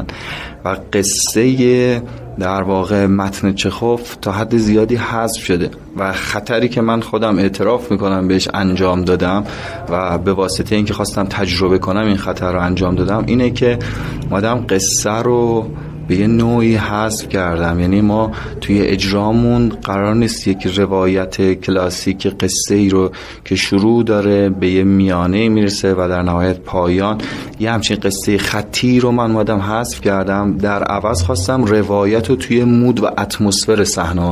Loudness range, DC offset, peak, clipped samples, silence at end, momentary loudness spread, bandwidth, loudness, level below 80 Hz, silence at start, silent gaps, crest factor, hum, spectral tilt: 2 LU; under 0.1%; -2 dBFS; under 0.1%; 0 s; 7 LU; 15.5 kHz; -15 LUFS; -32 dBFS; 0 s; none; 14 dB; none; -5 dB/octave